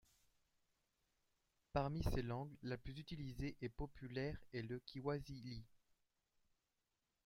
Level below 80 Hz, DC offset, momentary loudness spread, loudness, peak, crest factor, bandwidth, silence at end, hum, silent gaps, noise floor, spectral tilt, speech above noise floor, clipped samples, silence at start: -58 dBFS; under 0.1%; 9 LU; -48 LUFS; -26 dBFS; 24 dB; 16 kHz; 1.5 s; none; none; -89 dBFS; -7 dB/octave; 43 dB; under 0.1%; 1.75 s